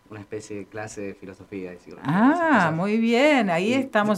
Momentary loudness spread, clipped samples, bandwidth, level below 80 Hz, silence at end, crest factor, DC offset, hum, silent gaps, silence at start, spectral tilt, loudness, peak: 18 LU; under 0.1%; 12.5 kHz; -64 dBFS; 0 s; 16 dB; under 0.1%; none; none; 0.1 s; -6 dB/octave; -20 LUFS; -6 dBFS